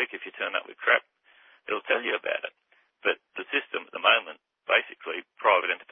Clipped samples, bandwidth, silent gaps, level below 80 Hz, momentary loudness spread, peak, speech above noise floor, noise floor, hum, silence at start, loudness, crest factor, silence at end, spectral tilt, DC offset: under 0.1%; 3.8 kHz; none; -82 dBFS; 13 LU; -6 dBFS; 32 dB; -59 dBFS; none; 0 s; -27 LUFS; 24 dB; 0 s; -5 dB/octave; under 0.1%